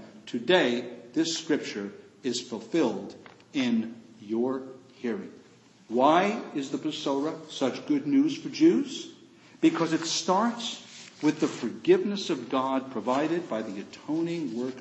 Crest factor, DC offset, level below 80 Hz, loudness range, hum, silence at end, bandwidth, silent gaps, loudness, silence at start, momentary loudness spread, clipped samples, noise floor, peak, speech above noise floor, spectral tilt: 22 dB; under 0.1%; -80 dBFS; 5 LU; none; 0 s; 8.4 kHz; none; -28 LUFS; 0 s; 14 LU; under 0.1%; -56 dBFS; -6 dBFS; 29 dB; -4.5 dB/octave